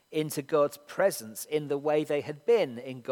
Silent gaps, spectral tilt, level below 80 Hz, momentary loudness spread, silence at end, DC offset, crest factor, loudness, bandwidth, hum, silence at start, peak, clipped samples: none; -4.5 dB/octave; -82 dBFS; 7 LU; 0 s; under 0.1%; 16 dB; -29 LUFS; 18.5 kHz; none; 0.1 s; -12 dBFS; under 0.1%